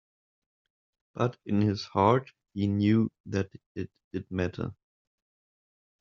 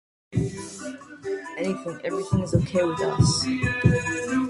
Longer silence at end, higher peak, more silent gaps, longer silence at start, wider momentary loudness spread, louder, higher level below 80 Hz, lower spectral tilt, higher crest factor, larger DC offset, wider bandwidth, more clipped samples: first, 1.3 s vs 0 s; about the same, -8 dBFS vs -6 dBFS; first, 3.20-3.24 s, 3.66-3.75 s, 4.04-4.11 s vs none; first, 1.15 s vs 0.3 s; about the same, 15 LU vs 14 LU; second, -29 LUFS vs -25 LUFS; second, -66 dBFS vs -42 dBFS; first, -7 dB/octave vs -5.5 dB/octave; about the same, 22 dB vs 20 dB; neither; second, 7.2 kHz vs 11.5 kHz; neither